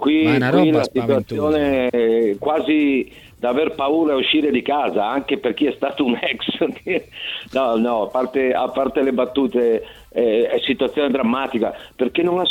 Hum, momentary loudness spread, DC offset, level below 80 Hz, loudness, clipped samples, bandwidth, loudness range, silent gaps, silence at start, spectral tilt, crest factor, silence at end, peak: none; 7 LU; under 0.1%; -52 dBFS; -19 LUFS; under 0.1%; 15.5 kHz; 3 LU; none; 0 s; -6.5 dB/octave; 16 dB; 0 s; -2 dBFS